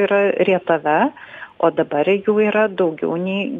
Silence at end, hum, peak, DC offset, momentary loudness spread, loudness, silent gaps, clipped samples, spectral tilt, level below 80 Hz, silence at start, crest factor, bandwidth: 0 s; none; -2 dBFS; under 0.1%; 6 LU; -18 LUFS; none; under 0.1%; -8.5 dB/octave; -66 dBFS; 0 s; 16 dB; 3.9 kHz